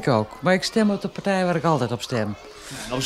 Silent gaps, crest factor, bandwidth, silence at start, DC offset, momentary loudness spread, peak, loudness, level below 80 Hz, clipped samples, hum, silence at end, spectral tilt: none; 18 dB; 14.5 kHz; 0 s; under 0.1%; 12 LU; -6 dBFS; -23 LUFS; -52 dBFS; under 0.1%; none; 0 s; -5.5 dB/octave